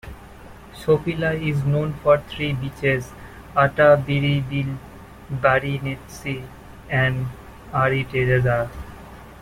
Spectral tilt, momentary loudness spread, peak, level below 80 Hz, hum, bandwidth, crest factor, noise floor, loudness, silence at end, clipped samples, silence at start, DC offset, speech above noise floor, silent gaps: -7 dB/octave; 21 LU; -2 dBFS; -44 dBFS; none; 15.5 kHz; 20 dB; -42 dBFS; -21 LUFS; 0 s; under 0.1%; 0.05 s; under 0.1%; 21 dB; none